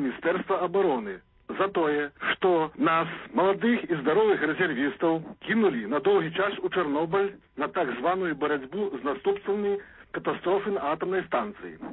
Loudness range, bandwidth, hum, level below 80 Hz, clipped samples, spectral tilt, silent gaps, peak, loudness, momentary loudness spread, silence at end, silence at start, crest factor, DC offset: 4 LU; 4.1 kHz; none; -64 dBFS; under 0.1%; -10 dB/octave; none; -12 dBFS; -27 LUFS; 8 LU; 0 s; 0 s; 14 dB; under 0.1%